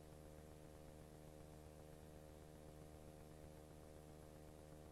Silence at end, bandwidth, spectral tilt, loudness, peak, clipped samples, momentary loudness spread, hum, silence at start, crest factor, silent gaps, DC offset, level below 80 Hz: 0 s; 13 kHz; -6 dB/octave; -61 LUFS; -46 dBFS; under 0.1%; 1 LU; none; 0 s; 14 dB; none; under 0.1%; -66 dBFS